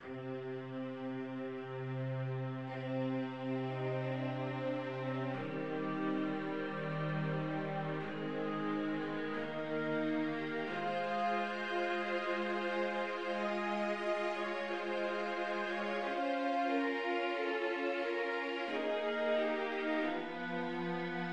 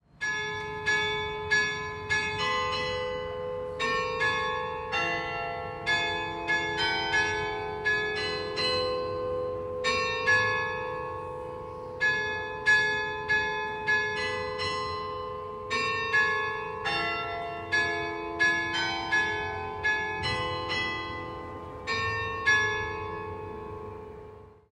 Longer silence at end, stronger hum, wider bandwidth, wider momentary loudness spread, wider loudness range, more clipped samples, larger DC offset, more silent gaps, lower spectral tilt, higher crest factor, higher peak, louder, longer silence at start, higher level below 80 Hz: second, 0 s vs 0.2 s; neither; second, 9.8 kHz vs 11 kHz; second, 5 LU vs 12 LU; about the same, 3 LU vs 3 LU; neither; neither; neither; first, -7 dB/octave vs -3 dB/octave; about the same, 14 dB vs 18 dB; second, -24 dBFS vs -12 dBFS; second, -37 LUFS vs -28 LUFS; second, 0 s vs 0.2 s; second, -78 dBFS vs -54 dBFS